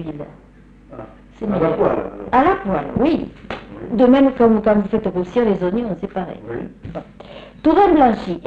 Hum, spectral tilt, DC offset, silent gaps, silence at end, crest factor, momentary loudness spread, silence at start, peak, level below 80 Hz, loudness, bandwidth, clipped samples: none; -8.5 dB/octave; under 0.1%; none; 0 s; 14 dB; 21 LU; 0 s; -4 dBFS; -42 dBFS; -17 LUFS; 7.2 kHz; under 0.1%